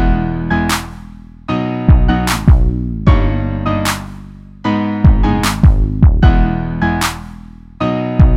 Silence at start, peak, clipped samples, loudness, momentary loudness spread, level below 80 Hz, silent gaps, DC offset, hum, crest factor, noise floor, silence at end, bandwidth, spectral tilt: 0 s; 0 dBFS; under 0.1%; -14 LUFS; 11 LU; -16 dBFS; none; under 0.1%; none; 12 dB; -34 dBFS; 0 s; 16 kHz; -6 dB/octave